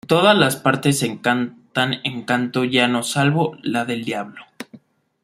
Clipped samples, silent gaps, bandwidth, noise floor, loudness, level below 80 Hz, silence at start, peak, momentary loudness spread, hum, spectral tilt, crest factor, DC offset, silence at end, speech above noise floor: under 0.1%; none; 16 kHz; -48 dBFS; -19 LUFS; -60 dBFS; 0.05 s; 0 dBFS; 16 LU; none; -4.5 dB/octave; 20 dB; under 0.1%; 0.5 s; 29 dB